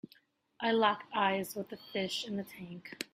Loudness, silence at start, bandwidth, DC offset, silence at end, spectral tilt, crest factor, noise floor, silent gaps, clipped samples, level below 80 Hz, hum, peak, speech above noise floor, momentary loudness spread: -34 LUFS; 0.6 s; 16 kHz; under 0.1%; 0.1 s; -4 dB/octave; 22 dB; -67 dBFS; none; under 0.1%; -76 dBFS; none; -14 dBFS; 33 dB; 15 LU